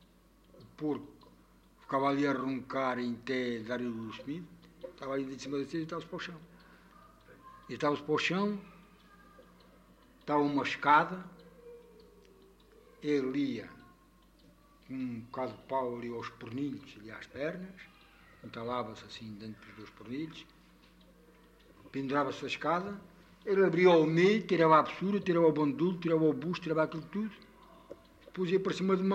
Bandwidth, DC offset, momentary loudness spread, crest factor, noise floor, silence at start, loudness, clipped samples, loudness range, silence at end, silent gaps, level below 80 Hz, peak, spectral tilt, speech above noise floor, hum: 9.6 kHz; under 0.1%; 22 LU; 22 dB; -63 dBFS; 0.55 s; -32 LUFS; under 0.1%; 14 LU; 0 s; none; -68 dBFS; -12 dBFS; -6.5 dB/octave; 31 dB; none